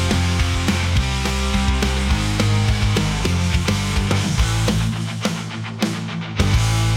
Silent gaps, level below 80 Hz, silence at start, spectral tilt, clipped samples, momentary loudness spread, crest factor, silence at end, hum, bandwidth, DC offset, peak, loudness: none; -26 dBFS; 0 s; -5 dB/octave; under 0.1%; 5 LU; 14 dB; 0 s; none; 16 kHz; under 0.1%; -6 dBFS; -20 LUFS